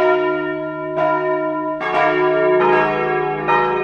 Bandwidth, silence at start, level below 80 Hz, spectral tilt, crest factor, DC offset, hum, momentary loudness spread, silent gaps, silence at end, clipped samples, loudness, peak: 6.6 kHz; 0 s; -54 dBFS; -7 dB/octave; 14 dB; under 0.1%; none; 7 LU; none; 0 s; under 0.1%; -17 LUFS; -4 dBFS